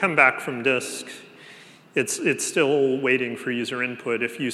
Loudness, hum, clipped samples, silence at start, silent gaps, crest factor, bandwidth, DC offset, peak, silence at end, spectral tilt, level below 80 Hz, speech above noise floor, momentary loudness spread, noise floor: -23 LUFS; none; under 0.1%; 0 s; none; 22 dB; 14.5 kHz; under 0.1%; -2 dBFS; 0 s; -3.5 dB/octave; -80 dBFS; 24 dB; 11 LU; -48 dBFS